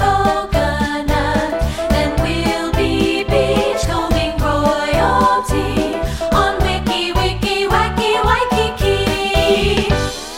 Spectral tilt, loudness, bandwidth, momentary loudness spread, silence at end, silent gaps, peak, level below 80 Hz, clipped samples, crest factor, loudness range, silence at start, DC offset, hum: -5 dB/octave; -16 LUFS; 17 kHz; 4 LU; 0 s; none; 0 dBFS; -24 dBFS; under 0.1%; 14 dB; 1 LU; 0 s; under 0.1%; none